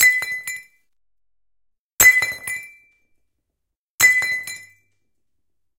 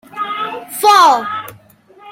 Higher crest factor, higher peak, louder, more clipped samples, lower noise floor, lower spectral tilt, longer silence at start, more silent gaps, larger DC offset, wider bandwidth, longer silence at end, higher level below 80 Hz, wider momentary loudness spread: first, 22 dB vs 14 dB; about the same, 0 dBFS vs 0 dBFS; second, -16 LUFS vs -13 LUFS; neither; first, -84 dBFS vs -45 dBFS; second, 1 dB/octave vs -1 dB/octave; second, 0 s vs 0.15 s; first, 1.79-1.97 s, 3.76-3.98 s vs none; neither; about the same, 17 kHz vs 16.5 kHz; first, 1.15 s vs 0 s; first, -56 dBFS vs -64 dBFS; first, 21 LU vs 16 LU